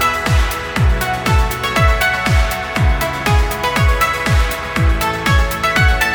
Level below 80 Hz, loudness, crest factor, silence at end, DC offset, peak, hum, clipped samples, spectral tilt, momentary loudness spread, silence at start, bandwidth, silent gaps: -18 dBFS; -15 LUFS; 14 dB; 0 s; under 0.1%; 0 dBFS; none; under 0.1%; -4.5 dB/octave; 4 LU; 0 s; 19.5 kHz; none